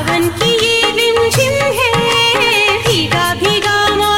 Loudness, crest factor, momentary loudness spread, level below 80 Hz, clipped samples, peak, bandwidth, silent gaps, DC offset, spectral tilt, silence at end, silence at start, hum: -11 LUFS; 12 dB; 3 LU; -36 dBFS; under 0.1%; 0 dBFS; 17 kHz; none; under 0.1%; -3 dB/octave; 0 s; 0 s; none